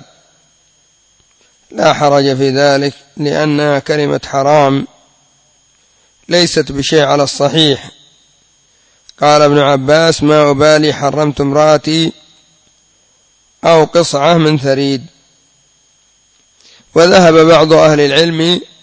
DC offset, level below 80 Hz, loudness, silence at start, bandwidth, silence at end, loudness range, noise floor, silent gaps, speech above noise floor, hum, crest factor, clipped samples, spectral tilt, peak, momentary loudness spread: under 0.1%; -46 dBFS; -10 LUFS; 1.7 s; 8 kHz; 0.2 s; 4 LU; -52 dBFS; none; 43 dB; none; 12 dB; 0.4%; -5 dB/octave; 0 dBFS; 8 LU